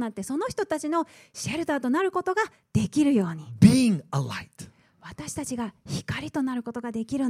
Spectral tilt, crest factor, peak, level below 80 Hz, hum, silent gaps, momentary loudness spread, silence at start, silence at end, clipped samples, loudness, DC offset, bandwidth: -6 dB/octave; 22 dB; -4 dBFS; -56 dBFS; none; none; 15 LU; 0 s; 0 s; under 0.1%; -26 LUFS; under 0.1%; 15 kHz